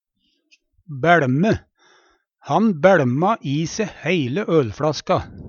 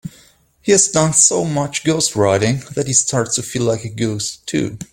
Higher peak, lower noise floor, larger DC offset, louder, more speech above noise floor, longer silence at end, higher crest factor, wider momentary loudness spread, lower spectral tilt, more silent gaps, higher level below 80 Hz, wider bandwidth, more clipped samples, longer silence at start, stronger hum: about the same, 0 dBFS vs 0 dBFS; first, -69 dBFS vs -51 dBFS; neither; second, -19 LUFS vs -16 LUFS; first, 51 dB vs 34 dB; about the same, 0 s vs 0.1 s; about the same, 20 dB vs 18 dB; about the same, 9 LU vs 10 LU; first, -6.5 dB/octave vs -3.5 dB/octave; neither; about the same, -50 dBFS vs -50 dBFS; second, 7.2 kHz vs 17 kHz; neither; first, 0.9 s vs 0.05 s; neither